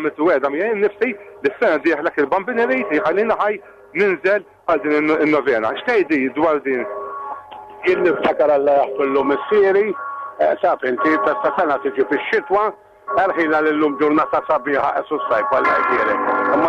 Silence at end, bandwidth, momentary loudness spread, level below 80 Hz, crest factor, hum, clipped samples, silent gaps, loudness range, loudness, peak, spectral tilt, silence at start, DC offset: 0 s; 7.2 kHz; 7 LU; -58 dBFS; 10 dB; none; under 0.1%; none; 2 LU; -18 LUFS; -8 dBFS; -6.5 dB/octave; 0 s; under 0.1%